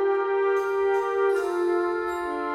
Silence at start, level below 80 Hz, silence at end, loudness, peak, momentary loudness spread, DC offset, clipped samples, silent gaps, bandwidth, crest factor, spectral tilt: 0 s; -62 dBFS; 0 s; -25 LUFS; -14 dBFS; 4 LU; under 0.1%; under 0.1%; none; 13 kHz; 10 dB; -4.5 dB/octave